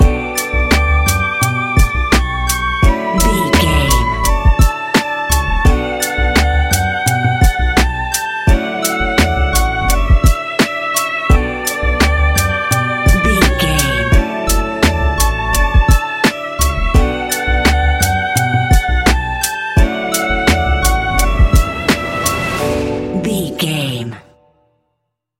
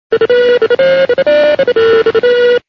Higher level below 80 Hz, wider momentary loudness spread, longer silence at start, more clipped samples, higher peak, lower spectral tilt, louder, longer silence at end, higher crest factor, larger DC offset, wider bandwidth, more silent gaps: first, -16 dBFS vs -50 dBFS; first, 5 LU vs 1 LU; about the same, 0 s vs 0.1 s; neither; about the same, 0 dBFS vs 0 dBFS; about the same, -4.5 dB/octave vs -5 dB/octave; second, -14 LUFS vs -9 LUFS; first, 1.2 s vs 0.1 s; first, 14 dB vs 8 dB; neither; first, 17 kHz vs 6.2 kHz; neither